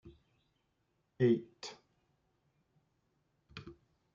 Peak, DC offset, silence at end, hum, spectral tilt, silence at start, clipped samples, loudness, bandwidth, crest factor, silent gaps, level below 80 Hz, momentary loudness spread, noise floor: -18 dBFS; under 0.1%; 0.4 s; none; -7 dB/octave; 0.05 s; under 0.1%; -33 LUFS; 7.2 kHz; 22 dB; none; -74 dBFS; 22 LU; -80 dBFS